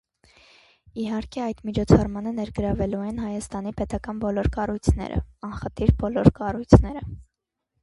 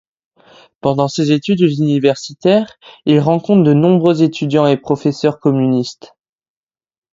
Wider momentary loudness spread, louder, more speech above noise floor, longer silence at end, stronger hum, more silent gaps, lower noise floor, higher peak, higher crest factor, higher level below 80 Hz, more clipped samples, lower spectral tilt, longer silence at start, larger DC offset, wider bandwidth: first, 15 LU vs 7 LU; second, -24 LUFS vs -14 LUFS; first, 58 dB vs 34 dB; second, 0.6 s vs 1.2 s; neither; neither; first, -81 dBFS vs -47 dBFS; about the same, 0 dBFS vs 0 dBFS; first, 24 dB vs 14 dB; first, -32 dBFS vs -56 dBFS; neither; about the same, -8 dB/octave vs -7 dB/octave; about the same, 0.95 s vs 0.85 s; neither; first, 11.5 kHz vs 7.8 kHz